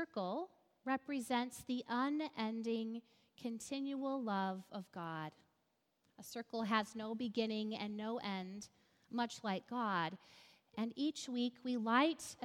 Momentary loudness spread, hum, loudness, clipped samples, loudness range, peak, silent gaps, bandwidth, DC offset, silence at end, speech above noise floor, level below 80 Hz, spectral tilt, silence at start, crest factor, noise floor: 12 LU; none; -41 LUFS; under 0.1%; 3 LU; -18 dBFS; none; 16 kHz; under 0.1%; 0 s; 41 dB; -84 dBFS; -4.5 dB/octave; 0 s; 22 dB; -82 dBFS